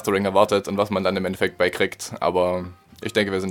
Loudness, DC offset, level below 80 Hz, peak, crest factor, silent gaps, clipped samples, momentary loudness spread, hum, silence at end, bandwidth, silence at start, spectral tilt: -22 LUFS; under 0.1%; -56 dBFS; -2 dBFS; 20 dB; none; under 0.1%; 7 LU; none; 0 s; 17.5 kHz; 0 s; -5 dB/octave